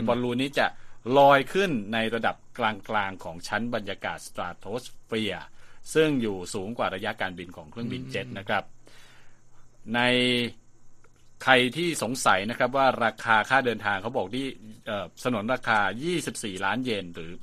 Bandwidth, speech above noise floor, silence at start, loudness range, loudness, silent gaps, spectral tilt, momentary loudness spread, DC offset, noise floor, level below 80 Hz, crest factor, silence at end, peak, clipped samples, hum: 15 kHz; 22 dB; 0 s; 7 LU; -26 LUFS; none; -4 dB/octave; 13 LU; under 0.1%; -48 dBFS; -54 dBFS; 26 dB; 0 s; -2 dBFS; under 0.1%; none